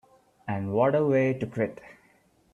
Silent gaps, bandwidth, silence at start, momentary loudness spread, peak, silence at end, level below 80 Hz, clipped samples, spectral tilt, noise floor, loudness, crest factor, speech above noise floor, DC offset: none; 10.5 kHz; 0.45 s; 11 LU; -10 dBFS; 0.6 s; -66 dBFS; under 0.1%; -9 dB/octave; -63 dBFS; -26 LUFS; 18 dB; 38 dB; under 0.1%